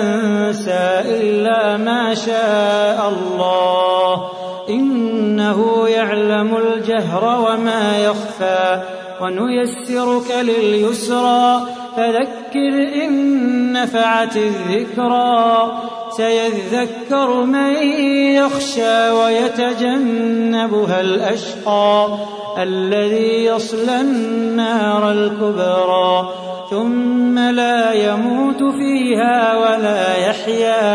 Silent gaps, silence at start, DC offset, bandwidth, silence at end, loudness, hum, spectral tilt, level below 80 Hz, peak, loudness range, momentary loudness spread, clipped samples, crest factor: none; 0 s; under 0.1%; 11 kHz; 0 s; -16 LUFS; none; -5 dB/octave; -66 dBFS; -2 dBFS; 2 LU; 6 LU; under 0.1%; 14 dB